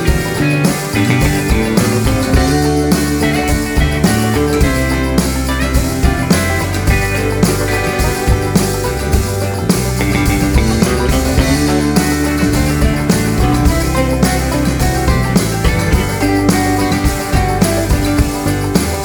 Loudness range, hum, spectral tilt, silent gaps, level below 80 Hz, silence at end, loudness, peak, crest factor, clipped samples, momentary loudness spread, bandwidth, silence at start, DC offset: 1 LU; none; -5.5 dB/octave; none; -20 dBFS; 0 s; -14 LUFS; 0 dBFS; 12 dB; under 0.1%; 3 LU; over 20 kHz; 0 s; under 0.1%